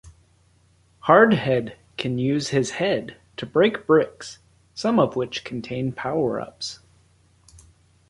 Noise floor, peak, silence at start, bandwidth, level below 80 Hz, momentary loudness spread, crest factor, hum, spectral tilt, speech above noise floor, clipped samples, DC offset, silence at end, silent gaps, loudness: -59 dBFS; -2 dBFS; 0.05 s; 11.5 kHz; -58 dBFS; 18 LU; 22 dB; none; -5.5 dB/octave; 38 dB; under 0.1%; under 0.1%; 1.35 s; none; -22 LUFS